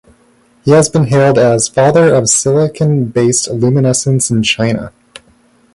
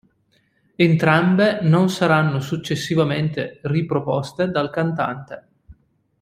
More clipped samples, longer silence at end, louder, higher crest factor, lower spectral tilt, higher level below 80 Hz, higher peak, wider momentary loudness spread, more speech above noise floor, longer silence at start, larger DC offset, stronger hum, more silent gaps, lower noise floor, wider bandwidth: neither; first, 0.85 s vs 0.5 s; first, -11 LUFS vs -19 LUFS; second, 12 dB vs 18 dB; second, -5 dB/octave vs -6.5 dB/octave; first, -46 dBFS vs -56 dBFS; about the same, 0 dBFS vs -2 dBFS; second, 5 LU vs 9 LU; second, 40 dB vs 44 dB; second, 0.65 s vs 0.8 s; neither; neither; neither; second, -50 dBFS vs -63 dBFS; second, 11.5 kHz vs 15 kHz